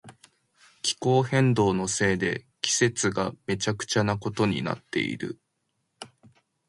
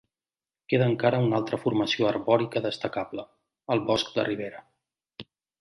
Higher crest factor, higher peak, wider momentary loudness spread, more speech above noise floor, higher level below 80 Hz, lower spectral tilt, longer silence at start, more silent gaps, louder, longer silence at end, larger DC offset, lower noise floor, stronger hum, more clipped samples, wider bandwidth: about the same, 22 dB vs 20 dB; about the same, -6 dBFS vs -8 dBFS; about the same, 14 LU vs 16 LU; second, 51 dB vs over 64 dB; first, -56 dBFS vs -64 dBFS; second, -4.5 dB/octave vs -6.5 dB/octave; second, 0.05 s vs 0.7 s; neither; about the same, -26 LUFS vs -26 LUFS; first, 0.6 s vs 0.4 s; neither; second, -77 dBFS vs under -90 dBFS; neither; neither; about the same, 11.5 kHz vs 11.5 kHz